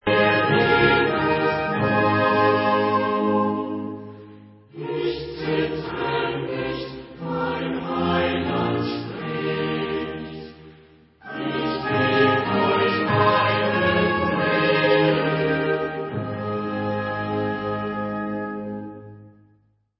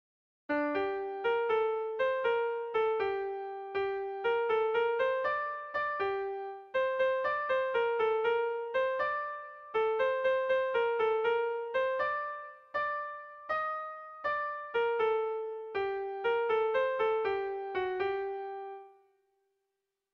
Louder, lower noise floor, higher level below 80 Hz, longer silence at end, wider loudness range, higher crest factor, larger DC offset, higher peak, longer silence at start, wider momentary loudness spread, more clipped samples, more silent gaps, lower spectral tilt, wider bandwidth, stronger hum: first, -22 LUFS vs -32 LUFS; second, -62 dBFS vs -85 dBFS; first, -48 dBFS vs -70 dBFS; second, 0.7 s vs 1.25 s; first, 8 LU vs 3 LU; first, 18 dB vs 12 dB; neither; first, -4 dBFS vs -20 dBFS; second, 0.05 s vs 0.5 s; first, 13 LU vs 9 LU; neither; neither; first, -10.5 dB/octave vs -5.5 dB/octave; about the same, 5.8 kHz vs 5.8 kHz; neither